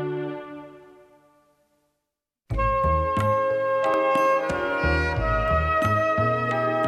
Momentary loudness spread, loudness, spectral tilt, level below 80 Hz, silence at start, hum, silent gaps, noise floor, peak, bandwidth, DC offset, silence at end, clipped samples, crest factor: 10 LU; -23 LUFS; -7 dB/octave; -36 dBFS; 0 s; none; none; -82 dBFS; -10 dBFS; 17 kHz; under 0.1%; 0 s; under 0.1%; 14 dB